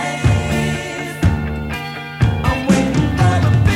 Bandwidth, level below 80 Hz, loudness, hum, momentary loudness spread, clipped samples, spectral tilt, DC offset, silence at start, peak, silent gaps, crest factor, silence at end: 15.5 kHz; -26 dBFS; -17 LUFS; none; 10 LU; under 0.1%; -6.5 dB/octave; under 0.1%; 0 s; -2 dBFS; none; 14 dB; 0 s